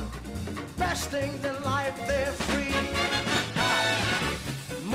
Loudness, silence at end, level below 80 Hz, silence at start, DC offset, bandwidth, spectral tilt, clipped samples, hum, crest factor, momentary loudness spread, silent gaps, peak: -28 LUFS; 0 s; -44 dBFS; 0 s; under 0.1%; 16 kHz; -3.5 dB/octave; under 0.1%; none; 18 dB; 11 LU; none; -12 dBFS